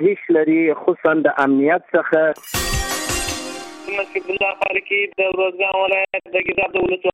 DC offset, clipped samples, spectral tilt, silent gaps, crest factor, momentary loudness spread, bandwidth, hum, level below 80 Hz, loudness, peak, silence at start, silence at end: under 0.1%; under 0.1%; -4 dB/octave; none; 16 dB; 7 LU; 16 kHz; none; -38 dBFS; -18 LUFS; -4 dBFS; 0 s; 0.05 s